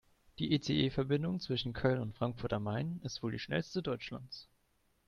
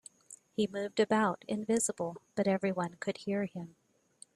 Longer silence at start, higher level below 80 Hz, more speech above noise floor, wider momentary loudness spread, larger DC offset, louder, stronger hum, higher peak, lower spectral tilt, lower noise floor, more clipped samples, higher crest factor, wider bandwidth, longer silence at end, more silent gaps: about the same, 0.4 s vs 0.3 s; first, -60 dBFS vs -74 dBFS; first, 39 dB vs 28 dB; second, 9 LU vs 14 LU; neither; second, -36 LUFS vs -33 LUFS; neither; about the same, -14 dBFS vs -16 dBFS; first, -6.5 dB/octave vs -4.5 dB/octave; first, -75 dBFS vs -61 dBFS; neither; about the same, 22 dB vs 18 dB; second, 7.2 kHz vs 12.5 kHz; about the same, 0.65 s vs 0.65 s; neither